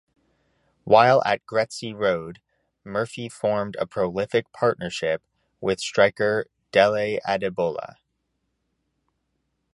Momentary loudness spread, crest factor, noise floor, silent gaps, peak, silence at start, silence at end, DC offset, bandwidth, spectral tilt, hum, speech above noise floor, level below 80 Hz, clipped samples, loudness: 12 LU; 22 dB; -75 dBFS; none; -2 dBFS; 0.85 s; 1.9 s; under 0.1%; 11.5 kHz; -5 dB/octave; none; 53 dB; -60 dBFS; under 0.1%; -23 LUFS